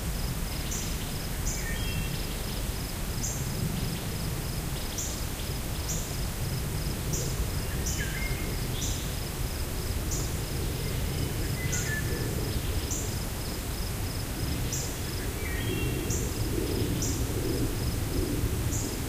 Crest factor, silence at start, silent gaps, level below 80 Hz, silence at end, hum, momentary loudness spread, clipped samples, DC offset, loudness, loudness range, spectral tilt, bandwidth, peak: 16 dB; 0 s; none; -36 dBFS; 0 s; none; 4 LU; under 0.1%; under 0.1%; -32 LUFS; 2 LU; -4 dB/octave; 16 kHz; -14 dBFS